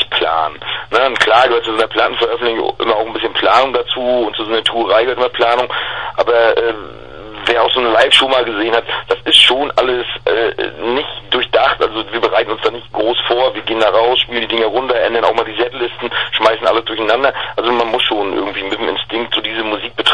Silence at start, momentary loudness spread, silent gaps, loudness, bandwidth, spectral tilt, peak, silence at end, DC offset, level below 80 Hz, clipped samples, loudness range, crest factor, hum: 0 s; 8 LU; none; -14 LUFS; 11 kHz; -3 dB/octave; 0 dBFS; 0 s; 1%; -46 dBFS; under 0.1%; 4 LU; 14 dB; none